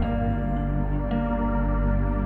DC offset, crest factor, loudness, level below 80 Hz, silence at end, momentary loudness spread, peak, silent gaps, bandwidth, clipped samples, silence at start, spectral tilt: under 0.1%; 10 dB; -26 LUFS; -26 dBFS; 0 s; 2 LU; -14 dBFS; none; 3.5 kHz; under 0.1%; 0 s; -11 dB/octave